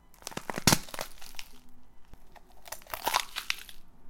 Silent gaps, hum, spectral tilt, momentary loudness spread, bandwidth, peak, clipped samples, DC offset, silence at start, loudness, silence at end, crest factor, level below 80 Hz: none; none; -2.5 dB/octave; 20 LU; 17 kHz; -4 dBFS; under 0.1%; under 0.1%; 0.1 s; -31 LUFS; 0 s; 32 dB; -52 dBFS